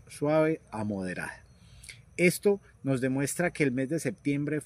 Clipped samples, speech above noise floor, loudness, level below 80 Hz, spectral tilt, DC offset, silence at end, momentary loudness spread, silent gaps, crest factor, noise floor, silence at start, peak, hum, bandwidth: under 0.1%; 22 dB; -29 LUFS; -62 dBFS; -6 dB/octave; under 0.1%; 0 s; 14 LU; none; 20 dB; -50 dBFS; 0.05 s; -10 dBFS; none; 15.5 kHz